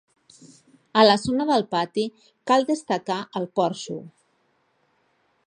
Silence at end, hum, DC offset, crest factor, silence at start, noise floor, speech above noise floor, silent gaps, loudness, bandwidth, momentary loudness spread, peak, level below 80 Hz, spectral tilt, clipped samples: 1.4 s; none; under 0.1%; 22 dB; 0.95 s; -67 dBFS; 45 dB; none; -23 LUFS; 11 kHz; 15 LU; -2 dBFS; -62 dBFS; -4.5 dB/octave; under 0.1%